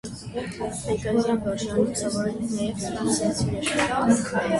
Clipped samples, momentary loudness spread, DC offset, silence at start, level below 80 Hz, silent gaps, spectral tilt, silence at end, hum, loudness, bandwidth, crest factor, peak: under 0.1%; 9 LU; under 0.1%; 0.05 s; -48 dBFS; none; -4.5 dB/octave; 0 s; none; -25 LUFS; 11.5 kHz; 16 dB; -8 dBFS